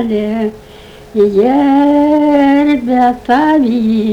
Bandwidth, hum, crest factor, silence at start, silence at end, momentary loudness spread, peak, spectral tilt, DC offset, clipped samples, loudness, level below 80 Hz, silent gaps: 7.6 kHz; none; 10 dB; 0 s; 0 s; 7 LU; 0 dBFS; -7 dB/octave; under 0.1%; under 0.1%; -11 LUFS; -42 dBFS; none